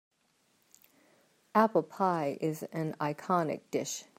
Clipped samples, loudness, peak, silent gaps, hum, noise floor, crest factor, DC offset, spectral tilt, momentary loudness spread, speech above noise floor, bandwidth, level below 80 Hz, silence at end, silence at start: under 0.1%; -32 LUFS; -10 dBFS; none; none; -72 dBFS; 22 dB; under 0.1%; -5.5 dB/octave; 8 LU; 41 dB; 16 kHz; -82 dBFS; 0.15 s; 1.55 s